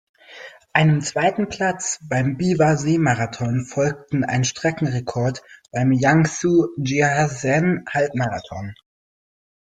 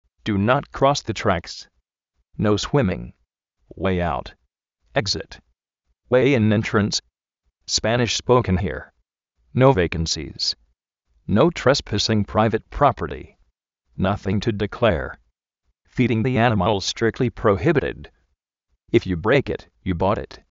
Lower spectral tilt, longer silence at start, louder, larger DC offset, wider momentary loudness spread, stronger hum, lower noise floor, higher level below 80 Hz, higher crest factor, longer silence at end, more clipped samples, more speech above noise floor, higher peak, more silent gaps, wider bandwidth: about the same, -5.5 dB/octave vs -5 dB/octave; about the same, 0.3 s vs 0.25 s; about the same, -20 LUFS vs -21 LUFS; neither; about the same, 10 LU vs 12 LU; neither; second, -42 dBFS vs -74 dBFS; second, -54 dBFS vs -42 dBFS; about the same, 18 dB vs 20 dB; first, 1.05 s vs 0.15 s; neither; second, 22 dB vs 54 dB; about the same, -2 dBFS vs -2 dBFS; neither; first, 9.4 kHz vs 8 kHz